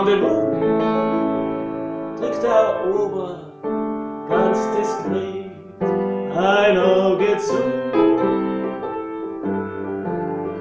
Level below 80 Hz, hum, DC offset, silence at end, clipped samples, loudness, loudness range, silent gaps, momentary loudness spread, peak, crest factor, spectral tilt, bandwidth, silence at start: -54 dBFS; none; under 0.1%; 0 s; under 0.1%; -20 LUFS; 4 LU; none; 11 LU; -4 dBFS; 16 dB; -6.5 dB/octave; 8 kHz; 0 s